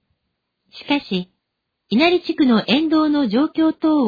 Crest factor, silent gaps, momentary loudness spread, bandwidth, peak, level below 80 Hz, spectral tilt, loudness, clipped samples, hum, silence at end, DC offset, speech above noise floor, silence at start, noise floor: 16 dB; none; 10 LU; 5 kHz; -4 dBFS; -58 dBFS; -7 dB/octave; -18 LUFS; under 0.1%; none; 0 s; under 0.1%; 60 dB; 0.75 s; -77 dBFS